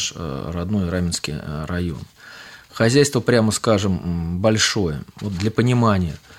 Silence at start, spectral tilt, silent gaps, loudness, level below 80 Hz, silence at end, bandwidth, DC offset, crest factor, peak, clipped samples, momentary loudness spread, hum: 0 s; -5 dB/octave; none; -20 LUFS; -42 dBFS; 0.05 s; 16 kHz; under 0.1%; 18 dB; -2 dBFS; under 0.1%; 13 LU; none